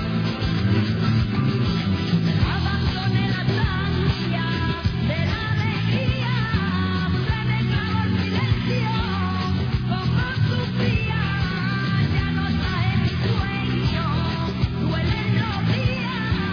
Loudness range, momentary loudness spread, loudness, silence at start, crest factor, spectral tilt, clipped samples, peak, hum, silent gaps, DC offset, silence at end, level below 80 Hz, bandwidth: 1 LU; 2 LU; -22 LUFS; 0 s; 14 dB; -7.5 dB/octave; under 0.1%; -8 dBFS; none; none; under 0.1%; 0 s; -34 dBFS; 5.4 kHz